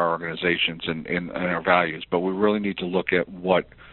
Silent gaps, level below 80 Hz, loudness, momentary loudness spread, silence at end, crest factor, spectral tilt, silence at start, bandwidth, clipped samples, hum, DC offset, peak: none; -56 dBFS; -24 LUFS; 6 LU; 0 s; 20 dB; -3 dB/octave; 0 s; 4.3 kHz; under 0.1%; none; under 0.1%; -4 dBFS